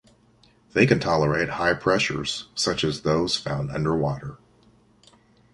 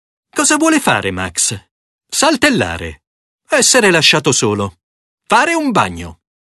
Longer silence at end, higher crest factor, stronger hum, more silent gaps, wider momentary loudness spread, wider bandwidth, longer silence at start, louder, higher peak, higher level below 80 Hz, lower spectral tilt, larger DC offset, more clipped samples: first, 1.2 s vs 0.3 s; first, 22 dB vs 16 dB; neither; second, none vs 1.71-1.99 s, 3.07-3.39 s, 4.83-5.18 s; second, 9 LU vs 16 LU; about the same, 11.5 kHz vs 12.5 kHz; first, 0.75 s vs 0.35 s; second, -23 LUFS vs -13 LUFS; second, -4 dBFS vs 0 dBFS; second, -48 dBFS vs -42 dBFS; first, -5 dB/octave vs -2.5 dB/octave; neither; neither